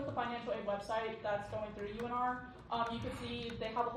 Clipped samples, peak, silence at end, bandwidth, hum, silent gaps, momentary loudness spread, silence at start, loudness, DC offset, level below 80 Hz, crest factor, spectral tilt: under 0.1%; -22 dBFS; 0 s; 13 kHz; none; none; 5 LU; 0 s; -40 LUFS; under 0.1%; -60 dBFS; 16 dB; -5.5 dB/octave